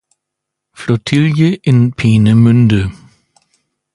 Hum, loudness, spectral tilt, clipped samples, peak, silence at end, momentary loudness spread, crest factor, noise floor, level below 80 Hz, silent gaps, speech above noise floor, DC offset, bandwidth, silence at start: none; -11 LUFS; -7.5 dB/octave; under 0.1%; 0 dBFS; 1.05 s; 9 LU; 12 dB; -78 dBFS; -40 dBFS; none; 68 dB; under 0.1%; 11 kHz; 0.8 s